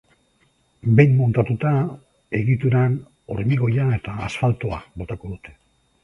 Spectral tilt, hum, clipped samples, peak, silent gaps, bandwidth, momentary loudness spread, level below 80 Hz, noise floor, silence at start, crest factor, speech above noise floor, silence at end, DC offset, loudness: -9 dB/octave; none; under 0.1%; 0 dBFS; none; 7.2 kHz; 16 LU; -46 dBFS; -63 dBFS; 0.85 s; 20 dB; 43 dB; 0.5 s; under 0.1%; -21 LUFS